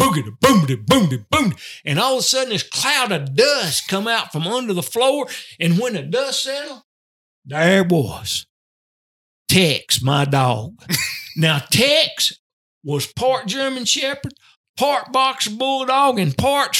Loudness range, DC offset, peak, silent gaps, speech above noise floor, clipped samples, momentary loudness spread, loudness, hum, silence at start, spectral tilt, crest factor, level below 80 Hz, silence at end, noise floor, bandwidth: 4 LU; under 0.1%; 0 dBFS; 6.84-7.42 s, 8.49-9.45 s, 12.39-12.81 s, 14.57-14.74 s; over 72 dB; under 0.1%; 9 LU; -18 LUFS; none; 0 s; -4 dB/octave; 18 dB; -52 dBFS; 0 s; under -90 dBFS; 18 kHz